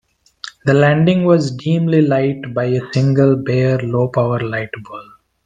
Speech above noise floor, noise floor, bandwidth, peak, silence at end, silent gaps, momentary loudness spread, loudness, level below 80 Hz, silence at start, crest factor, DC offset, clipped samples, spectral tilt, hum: 22 dB; -36 dBFS; 9 kHz; 0 dBFS; 0.45 s; none; 16 LU; -15 LUFS; -52 dBFS; 0.65 s; 16 dB; under 0.1%; under 0.1%; -8 dB/octave; none